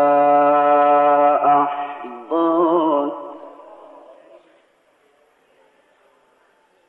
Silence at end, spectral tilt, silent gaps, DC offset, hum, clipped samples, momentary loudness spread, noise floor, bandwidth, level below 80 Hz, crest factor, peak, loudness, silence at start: 3.4 s; -8 dB/octave; none; under 0.1%; none; under 0.1%; 18 LU; -59 dBFS; 4 kHz; -80 dBFS; 14 dB; -6 dBFS; -16 LUFS; 0 s